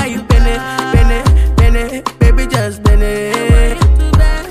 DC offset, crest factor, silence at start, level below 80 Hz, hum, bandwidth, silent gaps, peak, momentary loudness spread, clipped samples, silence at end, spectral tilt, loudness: under 0.1%; 10 dB; 0 s; -12 dBFS; none; 14.5 kHz; none; 0 dBFS; 5 LU; under 0.1%; 0 s; -6 dB/octave; -13 LUFS